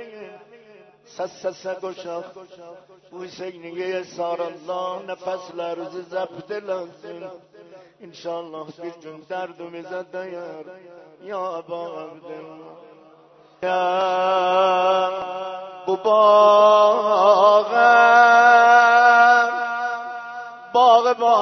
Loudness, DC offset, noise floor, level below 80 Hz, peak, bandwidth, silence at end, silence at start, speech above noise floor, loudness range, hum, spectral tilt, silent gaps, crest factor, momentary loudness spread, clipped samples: -17 LUFS; under 0.1%; -51 dBFS; -74 dBFS; -2 dBFS; 6.4 kHz; 0 s; 0 s; 31 dB; 20 LU; none; -3.5 dB/octave; none; 18 dB; 23 LU; under 0.1%